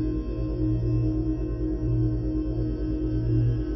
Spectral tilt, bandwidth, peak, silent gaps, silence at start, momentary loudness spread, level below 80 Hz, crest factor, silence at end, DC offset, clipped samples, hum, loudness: -11 dB/octave; 5.8 kHz; -14 dBFS; none; 0 s; 4 LU; -30 dBFS; 12 dB; 0 s; under 0.1%; under 0.1%; 60 Hz at -40 dBFS; -27 LUFS